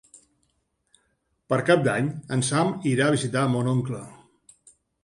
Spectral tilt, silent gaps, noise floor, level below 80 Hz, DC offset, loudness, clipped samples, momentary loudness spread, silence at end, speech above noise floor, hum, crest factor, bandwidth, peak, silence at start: -5.5 dB/octave; none; -72 dBFS; -62 dBFS; under 0.1%; -24 LUFS; under 0.1%; 8 LU; 0.9 s; 49 dB; none; 22 dB; 11.5 kHz; -4 dBFS; 1.5 s